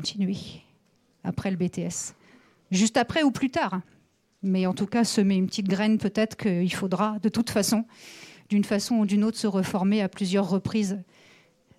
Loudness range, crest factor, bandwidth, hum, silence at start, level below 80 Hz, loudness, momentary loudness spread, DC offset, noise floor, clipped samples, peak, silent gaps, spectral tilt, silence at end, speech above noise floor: 2 LU; 16 dB; 14 kHz; none; 0 s; -62 dBFS; -26 LUFS; 11 LU; under 0.1%; -65 dBFS; under 0.1%; -10 dBFS; none; -5 dB/octave; 0.75 s; 40 dB